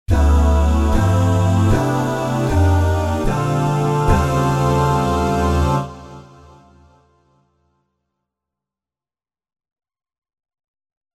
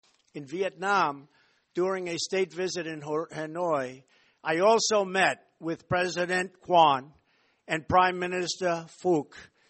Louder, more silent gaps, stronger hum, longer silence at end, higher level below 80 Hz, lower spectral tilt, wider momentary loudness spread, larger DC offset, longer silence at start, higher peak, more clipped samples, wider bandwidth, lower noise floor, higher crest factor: first, -17 LUFS vs -27 LUFS; neither; neither; first, 4.95 s vs 0.25 s; first, -24 dBFS vs -64 dBFS; first, -7 dB/octave vs -3.5 dB/octave; second, 4 LU vs 14 LU; neither; second, 0.1 s vs 0.35 s; first, -2 dBFS vs -8 dBFS; neither; first, 14 kHz vs 8.8 kHz; first, under -90 dBFS vs -68 dBFS; about the same, 16 dB vs 20 dB